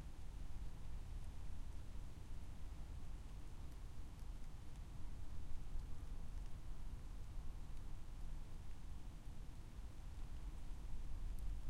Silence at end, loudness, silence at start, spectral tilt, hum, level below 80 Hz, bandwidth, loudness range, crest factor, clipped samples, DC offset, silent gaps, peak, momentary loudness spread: 0 s; -56 LUFS; 0 s; -6 dB/octave; none; -50 dBFS; 11.5 kHz; 1 LU; 14 dB; under 0.1%; under 0.1%; none; -30 dBFS; 3 LU